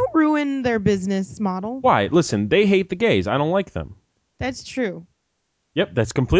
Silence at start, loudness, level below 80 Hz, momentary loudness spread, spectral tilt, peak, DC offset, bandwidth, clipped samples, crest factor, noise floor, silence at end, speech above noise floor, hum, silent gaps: 0 s; -21 LUFS; -40 dBFS; 11 LU; -6 dB/octave; -4 dBFS; under 0.1%; 8 kHz; under 0.1%; 16 dB; -73 dBFS; 0 s; 53 dB; none; none